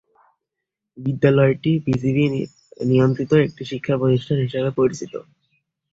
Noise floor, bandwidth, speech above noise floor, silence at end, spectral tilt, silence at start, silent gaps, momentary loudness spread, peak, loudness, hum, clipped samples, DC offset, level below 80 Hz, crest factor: -83 dBFS; 7.8 kHz; 64 dB; 0.7 s; -8 dB/octave; 0.95 s; none; 12 LU; -2 dBFS; -20 LUFS; none; under 0.1%; under 0.1%; -54 dBFS; 18 dB